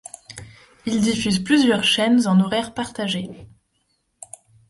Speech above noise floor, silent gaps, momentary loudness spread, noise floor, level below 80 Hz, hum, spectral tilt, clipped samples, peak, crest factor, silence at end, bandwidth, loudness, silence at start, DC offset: 50 dB; none; 23 LU; -69 dBFS; -54 dBFS; none; -4.5 dB/octave; under 0.1%; -6 dBFS; 16 dB; 1.25 s; 11.5 kHz; -19 LUFS; 0.3 s; under 0.1%